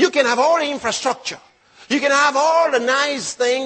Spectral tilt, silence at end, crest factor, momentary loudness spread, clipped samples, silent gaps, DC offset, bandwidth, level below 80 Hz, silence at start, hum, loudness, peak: -1.5 dB/octave; 0 s; 16 dB; 8 LU; under 0.1%; none; under 0.1%; 8.8 kHz; -64 dBFS; 0 s; none; -17 LUFS; -2 dBFS